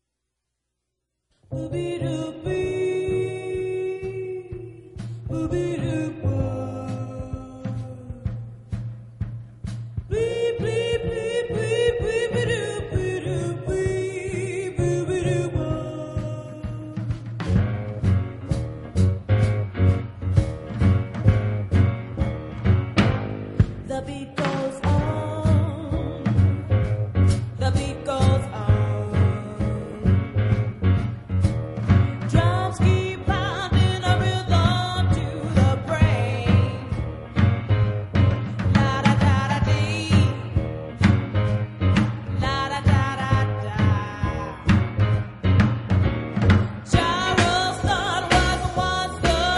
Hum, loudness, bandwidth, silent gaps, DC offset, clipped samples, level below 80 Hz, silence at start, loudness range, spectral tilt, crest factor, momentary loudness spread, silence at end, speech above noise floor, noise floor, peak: none; -23 LUFS; 11.5 kHz; none; under 0.1%; under 0.1%; -36 dBFS; 1.5 s; 7 LU; -6.5 dB/octave; 20 dB; 11 LU; 0 s; 54 dB; -80 dBFS; -2 dBFS